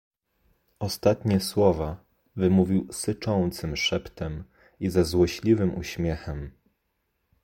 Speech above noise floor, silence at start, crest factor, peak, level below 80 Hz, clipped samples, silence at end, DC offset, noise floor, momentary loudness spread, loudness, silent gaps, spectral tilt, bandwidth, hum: 51 dB; 0.8 s; 20 dB; -6 dBFS; -44 dBFS; under 0.1%; 0.95 s; under 0.1%; -76 dBFS; 13 LU; -26 LUFS; none; -6 dB/octave; 16.5 kHz; none